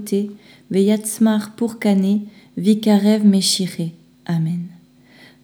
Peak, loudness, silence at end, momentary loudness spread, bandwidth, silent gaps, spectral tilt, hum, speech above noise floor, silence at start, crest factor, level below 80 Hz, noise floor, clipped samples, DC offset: -4 dBFS; -18 LUFS; 0.75 s; 14 LU; 18 kHz; none; -5.5 dB/octave; none; 30 dB; 0 s; 16 dB; -68 dBFS; -48 dBFS; under 0.1%; under 0.1%